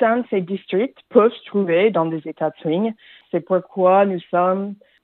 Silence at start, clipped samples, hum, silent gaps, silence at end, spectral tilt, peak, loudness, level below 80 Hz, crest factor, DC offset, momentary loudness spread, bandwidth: 0 s; under 0.1%; none; none; 0.3 s; -11 dB/octave; 0 dBFS; -20 LUFS; -76 dBFS; 18 dB; under 0.1%; 9 LU; 4.2 kHz